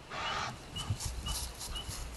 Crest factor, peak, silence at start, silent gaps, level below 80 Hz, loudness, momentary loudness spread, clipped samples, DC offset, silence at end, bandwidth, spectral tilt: 16 dB; -24 dBFS; 0 s; none; -46 dBFS; -38 LUFS; 5 LU; under 0.1%; under 0.1%; 0 s; 13 kHz; -2.5 dB/octave